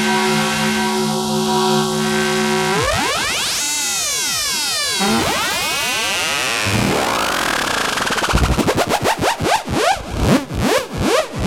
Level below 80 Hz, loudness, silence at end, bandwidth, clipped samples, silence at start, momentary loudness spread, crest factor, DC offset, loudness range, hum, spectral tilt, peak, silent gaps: -32 dBFS; -17 LUFS; 0 s; 17.5 kHz; under 0.1%; 0 s; 2 LU; 16 dB; under 0.1%; 1 LU; none; -3 dB/octave; -2 dBFS; none